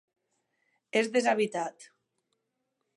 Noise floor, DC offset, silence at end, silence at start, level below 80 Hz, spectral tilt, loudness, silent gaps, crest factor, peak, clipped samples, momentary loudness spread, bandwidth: -82 dBFS; under 0.1%; 1.1 s; 0.95 s; -82 dBFS; -3.5 dB/octave; -29 LUFS; none; 20 dB; -12 dBFS; under 0.1%; 10 LU; 11.5 kHz